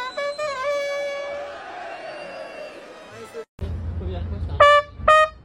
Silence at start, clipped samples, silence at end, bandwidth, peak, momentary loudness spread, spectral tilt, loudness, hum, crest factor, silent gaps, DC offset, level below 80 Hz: 0 s; under 0.1%; 0.05 s; 11.5 kHz; -2 dBFS; 22 LU; -4.5 dB/octave; -21 LUFS; none; 20 dB; 3.48-3.58 s; under 0.1%; -38 dBFS